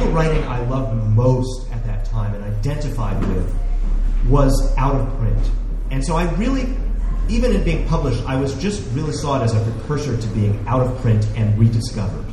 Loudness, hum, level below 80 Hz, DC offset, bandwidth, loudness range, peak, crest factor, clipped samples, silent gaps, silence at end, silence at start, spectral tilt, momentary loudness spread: -20 LUFS; none; -22 dBFS; under 0.1%; 11.5 kHz; 2 LU; -2 dBFS; 16 dB; under 0.1%; none; 0 s; 0 s; -7 dB/octave; 8 LU